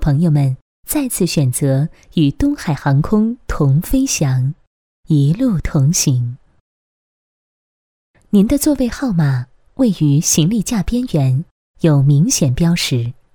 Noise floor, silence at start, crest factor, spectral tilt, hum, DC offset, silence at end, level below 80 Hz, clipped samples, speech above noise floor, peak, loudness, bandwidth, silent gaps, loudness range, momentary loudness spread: under -90 dBFS; 0 s; 16 dB; -5.5 dB/octave; none; under 0.1%; 0.2 s; -32 dBFS; under 0.1%; over 76 dB; 0 dBFS; -16 LUFS; 19 kHz; 0.61-0.83 s, 4.67-5.03 s, 6.60-8.14 s, 11.51-11.74 s; 4 LU; 7 LU